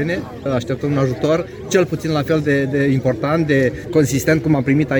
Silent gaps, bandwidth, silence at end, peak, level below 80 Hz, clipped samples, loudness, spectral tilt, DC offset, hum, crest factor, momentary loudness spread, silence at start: none; over 20 kHz; 0 s; -2 dBFS; -44 dBFS; under 0.1%; -18 LUFS; -6.5 dB/octave; under 0.1%; none; 16 dB; 5 LU; 0 s